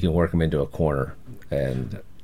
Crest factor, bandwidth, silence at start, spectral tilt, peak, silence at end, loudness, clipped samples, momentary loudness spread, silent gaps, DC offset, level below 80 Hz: 16 dB; 14 kHz; 0 s; -8.5 dB/octave; -8 dBFS; 0.25 s; -25 LUFS; under 0.1%; 11 LU; none; 1%; -40 dBFS